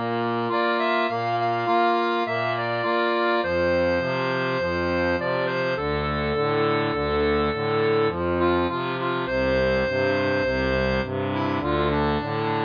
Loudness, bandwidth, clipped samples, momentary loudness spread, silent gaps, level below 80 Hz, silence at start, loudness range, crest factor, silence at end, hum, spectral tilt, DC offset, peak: -23 LUFS; 5.2 kHz; under 0.1%; 3 LU; none; -42 dBFS; 0 s; 1 LU; 12 dB; 0 s; none; -7.5 dB/octave; under 0.1%; -10 dBFS